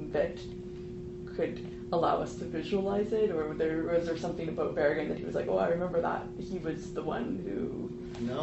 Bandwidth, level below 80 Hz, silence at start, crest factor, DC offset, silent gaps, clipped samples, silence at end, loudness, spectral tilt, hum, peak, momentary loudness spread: 8.2 kHz; -52 dBFS; 0 s; 18 dB; under 0.1%; none; under 0.1%; 0 s; -33 LUFS; -7 dB/octave; none; -16 dBFS; 11 LU